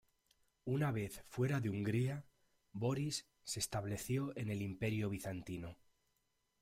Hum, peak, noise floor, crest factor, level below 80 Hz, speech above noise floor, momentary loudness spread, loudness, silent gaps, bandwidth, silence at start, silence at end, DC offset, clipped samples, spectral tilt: none; -24 dBFS; -82 dBFS; 16 dB; -66 dBFS; 42 dB; 10 LU; -41 LUFS; none; 16 kHz; 0.65 s; 0.9 s; under 0.1%; under 0.1%; -5.5 dB/octave